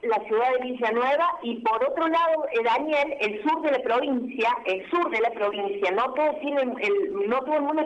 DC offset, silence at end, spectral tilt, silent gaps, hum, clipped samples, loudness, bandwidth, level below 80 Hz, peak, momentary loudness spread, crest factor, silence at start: under 0.1%; 0 s; -5 dB/octave; none; none; under 0.1%; -25 LUFS; 9 kHz; -66 dBFS; -14 dBFS; 3 LU; 12 dB; 0.05 s